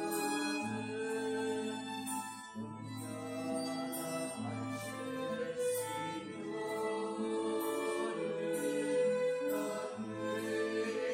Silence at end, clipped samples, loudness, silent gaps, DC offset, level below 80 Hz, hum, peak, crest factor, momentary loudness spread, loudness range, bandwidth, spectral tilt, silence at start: 0 s; under 0.1%; -38 LUFS; none; under 0.1%; -78 dBFS; none; -24 dBFS; 14 dB; 7 LU; 5 LU; 16 kHz; -4 dB/octave; 0 s